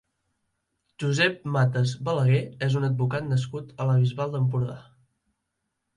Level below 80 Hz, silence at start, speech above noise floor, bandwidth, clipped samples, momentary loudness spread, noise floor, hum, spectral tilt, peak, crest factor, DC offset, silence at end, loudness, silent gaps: -60 dBFS; 1 s; 56 dB; 10.5 kHz; under 0.1%; 7 LU; -80 dBFS; none; -6.5 dB/octave; -10 dBFS; 16 dB; under 0.1%; 1.15 s; -25 LUFS; none